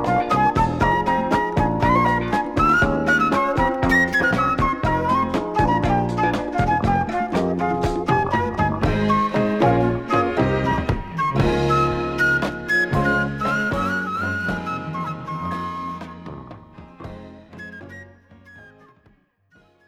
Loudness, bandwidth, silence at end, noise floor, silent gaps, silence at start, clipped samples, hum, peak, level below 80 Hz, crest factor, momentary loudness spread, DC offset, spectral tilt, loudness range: -20 LUFS; 15.5 kHz; 1.2 s; -58 dBFS; none; 0 s; under 0.1%; none; -4 dBFS; -36 dBFS; 16 dB; 13 LU; under 0.1%; -6.5 dB/octave; 13 LU